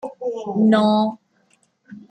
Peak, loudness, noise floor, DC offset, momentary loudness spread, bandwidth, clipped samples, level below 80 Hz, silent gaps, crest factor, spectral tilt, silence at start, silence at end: -4 dBFS; -19 LUFS; -62 dBFS; under 0.1%; 12 LU; 8.8 kHz; under 0.1%; -70 dBFS; none; 18 dB; -7.5 dB/octave; 0.05 s; 0.1 s